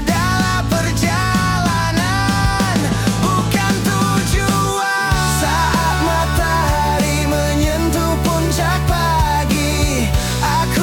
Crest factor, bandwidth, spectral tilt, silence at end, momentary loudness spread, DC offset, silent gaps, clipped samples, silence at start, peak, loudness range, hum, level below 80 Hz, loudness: 12 dB; 18 kHz; -4.5 dB/octave; 0 s; 1 LU; under 0.1%; none; under 0.1%; 0 s; -4 dBFS; 0 LU; none; -24 dBFS; -16 LUFS